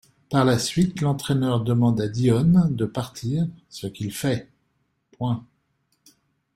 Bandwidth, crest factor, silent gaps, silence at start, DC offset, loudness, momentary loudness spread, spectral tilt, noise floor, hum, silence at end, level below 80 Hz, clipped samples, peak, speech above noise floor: 16 kHz; 18 dB; none; 0.3 s; under 0.1%; -23 LUFS; 11 LU; -6.5 dB/octave; -71 dBFS; none; 1.15 s; -52 dBFS; under 0.1%; -6 dBFS; 49 dB